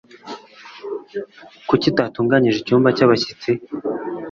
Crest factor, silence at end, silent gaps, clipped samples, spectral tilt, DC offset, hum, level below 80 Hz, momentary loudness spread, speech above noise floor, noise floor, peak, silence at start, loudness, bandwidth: 18 dB; 0 s; none; under 0.1%; -6.5 dB/octave; under 0.1%; none; -56 dBFS; 20 LU; 23 dB; -40 dBFS; -2 dBFS; 0.25 s; -18 LUFS; 7.4 kHz